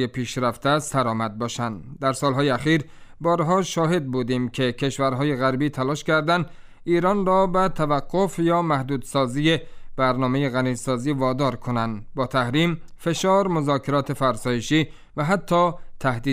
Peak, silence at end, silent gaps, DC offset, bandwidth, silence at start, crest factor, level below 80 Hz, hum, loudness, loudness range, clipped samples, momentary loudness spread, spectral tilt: -6 dBFS; 0 s; none; under 0.1%; 15.5 kHz; 0 s; 16 dB; -44 dBFS; none; -23 LUFS; 2 LU; under 0.1%; 7 LU; -6 dB/octave